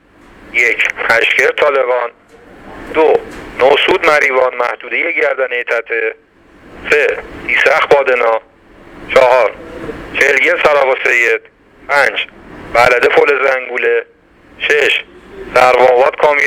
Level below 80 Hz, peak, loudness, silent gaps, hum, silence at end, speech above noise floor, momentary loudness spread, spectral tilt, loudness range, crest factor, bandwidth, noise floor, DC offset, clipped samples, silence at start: -46 dBFS; 0 dBFS; -11 LUFS; none; none; 0 s; 30 dB; 10 LU; -3 dB/octave; 2 LU; 12 dB; 16.5 kHz; -41 dBFS; under 0.1%; 0.1%; 0.5 s